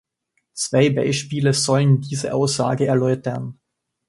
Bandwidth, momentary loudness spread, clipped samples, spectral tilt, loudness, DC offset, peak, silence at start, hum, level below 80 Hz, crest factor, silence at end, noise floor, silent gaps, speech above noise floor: 11.5 kHz; 10 LU; under 0.1%; -5.5 dB/octave; -19 LUFS; under 0.1%; -4 dBFS; 0.55 s; none; -58 dBFS; 16 dB; 0.55 s; -72 dBFS; none; 53 dB